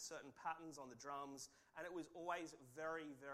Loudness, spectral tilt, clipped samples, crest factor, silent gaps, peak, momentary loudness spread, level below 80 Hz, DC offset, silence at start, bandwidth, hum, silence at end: -52 LUFS; -3 dB/octave; under 0.1%; 20 dB; none; -32 dBFS; 8 LU; -84 dBFS; under 0.1%; 0 s; 15.5 kHz; none; 0 s